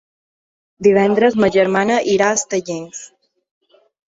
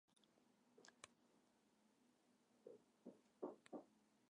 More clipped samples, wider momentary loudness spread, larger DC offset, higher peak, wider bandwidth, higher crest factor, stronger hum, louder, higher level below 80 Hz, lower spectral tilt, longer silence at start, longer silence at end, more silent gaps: neither; first, 14 LU vs 10 LU; neither; first, -2 dBFS vs -38 dBFS; second, 8 kHz vs 10 kHz; second, 16 dB vs 26 dB; neither; first, -15 LUFS vs -62 LUFS; first, -56 dBFS vs under -90 dBFS; about the same, -4.5 dB/octave vs -4.5 dB/octave; first, 0.8 s vs 0.1 s; first, 1.05 s vs 0.05 s; neither